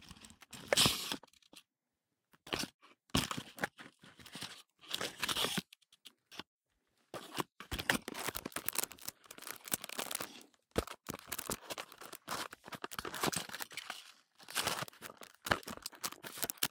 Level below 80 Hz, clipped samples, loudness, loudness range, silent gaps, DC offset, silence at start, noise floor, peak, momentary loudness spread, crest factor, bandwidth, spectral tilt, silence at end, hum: -62 dBFS; under 0.1%; -39 LUFS; 5 LU; 2.74-2.79 s, 6.47-6.60 s; under 0.1%; 0 s; -89 dBFS; -10 dBFS; 17 LU; 32 dB; 18 kHz; -2 dB/octave; 0.05 s; none